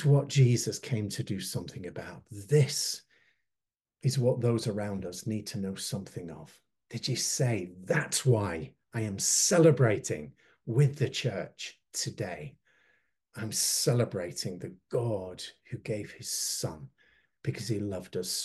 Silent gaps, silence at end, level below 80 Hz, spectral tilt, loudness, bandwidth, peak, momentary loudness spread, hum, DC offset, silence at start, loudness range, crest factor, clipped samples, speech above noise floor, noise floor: none; 0 s; -66 dBFS; -4.5 dB/octave; -30 LUFS; 12.5 kHz; -10 dBFS; 17 LU; none; under 0.1%; 0 s; 7 LU; 20 dB; under 0.1%; 59 dB; -89 dBFS